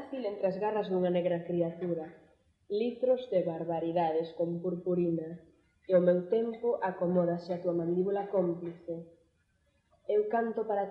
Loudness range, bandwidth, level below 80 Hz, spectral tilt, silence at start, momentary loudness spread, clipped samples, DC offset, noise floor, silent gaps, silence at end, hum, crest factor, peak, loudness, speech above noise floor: 3 LU; 5.6 kHz; -74 dBFS; -10 dB/octave; 0 s; 9 LU; under 0.1%; under 0.1%; -73 dBFS; none; 0 s; none; 18 dB; -14 dBFS; -32 LUFS; 42 dB